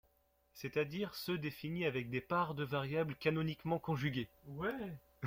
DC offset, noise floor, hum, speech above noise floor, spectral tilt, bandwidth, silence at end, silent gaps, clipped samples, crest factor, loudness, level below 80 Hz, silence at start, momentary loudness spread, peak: under 0.1%; -75 dBFS; none; 36 dB; -6.5 dB/octave; 16.5 kHz; 0 s; none; under 0.1%; 18 dB; -39 LUFS; -68 dBFS; 0.55 s; 6 LU; -22 dBFS